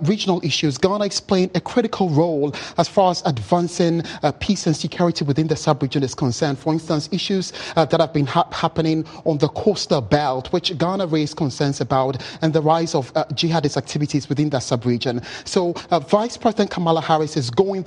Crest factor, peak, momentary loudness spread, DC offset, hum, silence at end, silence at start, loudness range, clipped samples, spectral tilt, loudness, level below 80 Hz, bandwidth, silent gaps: 18 dB; 0 dBFS; 4 LU; under 0.1%; none; 0 s; 0 s; 1 LU; under 0.1%; -5.5 dB/octave; -20 LUFS; -50 dBFS; 11 kHz; none